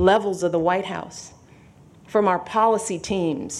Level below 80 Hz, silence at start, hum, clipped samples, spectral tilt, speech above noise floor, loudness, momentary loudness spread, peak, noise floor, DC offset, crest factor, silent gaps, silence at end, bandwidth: -52 dBFS; 0 s; none; under 0.1%; -5 dB/octave; 28 dB; -22 LUFS; 15 LU; -4 dBFS; -49 dBFS; under 0.1%; 18 dB; none; 0 s; 13 kHz